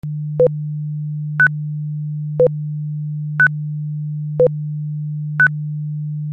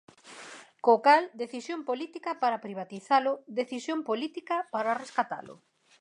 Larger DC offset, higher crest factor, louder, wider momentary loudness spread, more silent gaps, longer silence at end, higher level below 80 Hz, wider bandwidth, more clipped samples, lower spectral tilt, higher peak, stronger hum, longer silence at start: neither; second, 14 dB vs 22 dB; first, -19 LUFS vs -29 LUFS; second, 9 LU vs 17 LU; neither; second, 0 s vs 0.45 s; first, -54 dBFS vs -86 dBFS; second, 3.5 kHz vs 11 kHz; neither; first, -10 dB/octave vs -4 dB/octave; first, -4 dBFS vs -8 dBFS; neither; second, 0.05 s vs 0.25 s